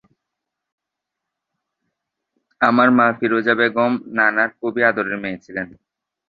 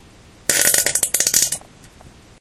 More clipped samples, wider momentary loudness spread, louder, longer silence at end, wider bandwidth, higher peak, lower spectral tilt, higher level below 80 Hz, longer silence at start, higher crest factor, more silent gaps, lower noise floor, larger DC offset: neither; first, 14 LU vs 9 LU; about the same, -17 LUFS vs -15 LUFS; first, 0.6 s vs 0.3 s; second, 5 kHz vs over 20 kHz; about the same, -2 dBFS vs 0 dBFS; first, -7.5 dB/octave vs 0.5 dB/octave; second, -62 dBFS vs -50 dBFS; first, 2.6 s vs 0.5 s; about the same, 18 dB vs 20 dB; neither; first, -82 dBFS vs -45 dBFS; neither